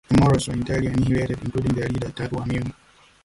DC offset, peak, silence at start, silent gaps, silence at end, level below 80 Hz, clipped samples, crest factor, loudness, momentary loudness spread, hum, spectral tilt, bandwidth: under 0.1%; -6 dBFS; 0.1 s; none; 0.5 s; -38 dBFS; under 0.1%; 16 dB; -23 LUFS; 10 LU; none; -7 dB/octave; 11.5 kHz